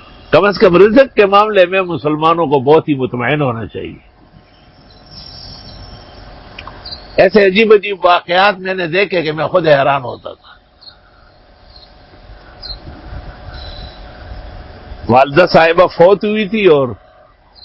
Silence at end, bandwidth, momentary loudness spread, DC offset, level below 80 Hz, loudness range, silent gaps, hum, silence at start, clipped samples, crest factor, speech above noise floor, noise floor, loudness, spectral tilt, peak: 0.7 s; 7.6 kHz; 24 LU; under 0.1%; -38 dBFS; 22 LU; none; none; 0.3 s; 0.2%; 14 dB; 35 dB; -45 dBFS; -11 LUFS; -7.5 dB/octave; 0 dBFS